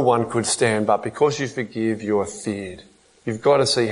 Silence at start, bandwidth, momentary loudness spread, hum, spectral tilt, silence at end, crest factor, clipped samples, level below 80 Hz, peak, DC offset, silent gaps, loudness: 0 s; 11 kHz; 12 LU; none; -4 dB/octave; 0 s; 18 dB; under 0.1%; -60 dBFS; -4 dBFS; under 0.1%; none; -21 LUFS